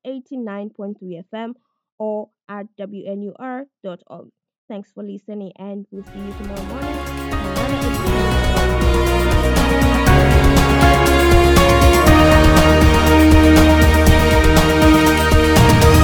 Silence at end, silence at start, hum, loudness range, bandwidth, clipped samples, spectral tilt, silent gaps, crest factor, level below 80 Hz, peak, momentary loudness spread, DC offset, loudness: 0 s; 0.05 s; none; 21 LU; 19 kHz; under 0.1%; -5.5 dB/octave; 1.92-1.98 s, 4.58-4.68 s; 14 dB; -20 dBFS; 0 dBFS; 22 LU; under 0.1%; -13 LUFS